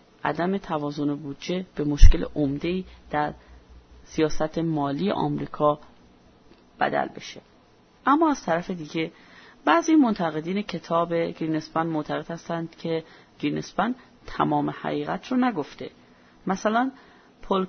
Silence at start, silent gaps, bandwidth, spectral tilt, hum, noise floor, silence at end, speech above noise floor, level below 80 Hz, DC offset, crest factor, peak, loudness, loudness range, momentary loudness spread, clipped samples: 0.25 s; none; 6.6 kHz; -6.5 dB/octave; none; -56 dBFS; 0 s; 33 dB; -28 dBFS; under 0.1%; 24 dB; 0 dBFS; -26 LUFS; 4 LU; 12 LU; under 0.1%